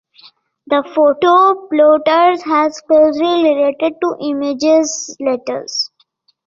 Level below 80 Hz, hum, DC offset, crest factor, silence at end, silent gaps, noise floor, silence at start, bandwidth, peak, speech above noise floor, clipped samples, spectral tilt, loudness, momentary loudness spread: -62 dBFS; none; under 0.1%; 14 dB; 0.6 s; none; -58 dBFS; 0.7 s; 7.6 kHz; 0 dBFS; 45 dB; under 0.1%; -2.5 dB/octave; -14 LUFS; 10 LU